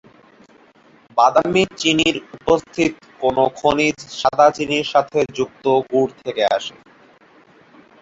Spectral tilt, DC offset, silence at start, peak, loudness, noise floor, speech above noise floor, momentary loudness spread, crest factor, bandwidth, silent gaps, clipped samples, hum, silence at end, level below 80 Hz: -4 dB/octave; under 0.1%; 1.15 s; 0 dBFS; -18 LUFS; -51 dBFS; 33 dB; 8 LU; 18 dB; 8 kHz; none; under 0.1%; none; 1.3 s; -52 dBFS